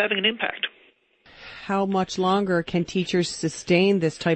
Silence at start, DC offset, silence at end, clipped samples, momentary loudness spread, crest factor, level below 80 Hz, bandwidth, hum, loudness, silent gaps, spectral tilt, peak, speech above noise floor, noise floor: 0 s; under 0.1%; 0 s; under 0.1%; 10 LU; 18 dB; -58 dBFS; 8.8 kHz; none; -23 LUFS; none; -5 dB/octave; -6 dBFS; 36 dB; -59 dBFS